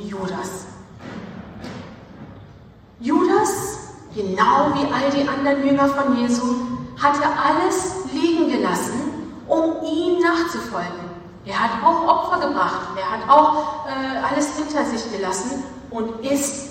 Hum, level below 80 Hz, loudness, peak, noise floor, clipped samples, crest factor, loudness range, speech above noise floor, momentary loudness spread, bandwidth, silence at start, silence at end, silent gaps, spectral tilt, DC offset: none; -52 dBFS; -20 LUFS; 0 dBFS; -45 dBFS; under 0.1%; 20 dB; 5 LU; 25 dB; 18 LU; 16 kHz; 0 s; 0 s; none; -4 dB/octave; under 0.1%